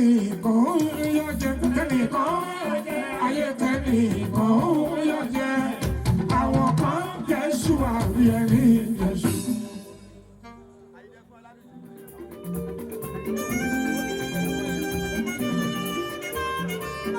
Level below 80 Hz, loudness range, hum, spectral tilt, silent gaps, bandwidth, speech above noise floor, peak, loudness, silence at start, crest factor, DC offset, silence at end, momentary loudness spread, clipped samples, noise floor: -42 dBFS; 11 LU; none; -6 dB/octave; none; 17.5 kHz; 29 dB; -8 dBFS; -24 LUFS; 0 s; 16 dB; under 0.1%; 0 s; 12 LU; under 0.1%; -50 dBFS